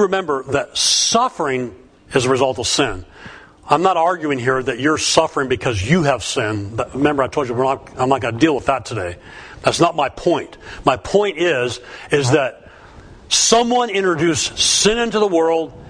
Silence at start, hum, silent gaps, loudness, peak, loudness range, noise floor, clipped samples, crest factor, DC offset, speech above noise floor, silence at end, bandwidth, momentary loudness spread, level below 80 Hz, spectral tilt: 0 s; none; none; -17 LUFS; 0 dBFS; 3 LU; -41 dBFS; under 0.1%; 18 dB; under 0.1%; 23 dB; 0 s; 11 kHz; 9 LU; -44 dBFS; -3.5 dB/octave